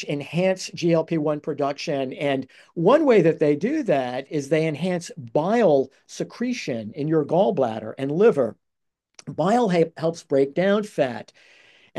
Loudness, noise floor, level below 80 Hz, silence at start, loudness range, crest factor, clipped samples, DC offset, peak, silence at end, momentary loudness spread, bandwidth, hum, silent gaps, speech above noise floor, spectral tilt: -22 LUFS; -81 dBFS; -72 dBFS; 0 s; 2 LU; 16 dB; under 0.1%; under 0.1%; -6 dBFS; 0 s; 10 LU; 12 kHz; none; none; 59 dB; -6.5 dB/octave